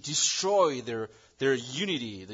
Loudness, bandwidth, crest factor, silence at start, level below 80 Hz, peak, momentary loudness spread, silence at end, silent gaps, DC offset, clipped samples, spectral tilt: -28 LUFS; 7.8 kHz; 18 dB; 0.05 s; -72 dBFS; -12 dBFS; 12 LU; 0 s; none; under 0.1%; under 0.1%; -2.5 dB/octave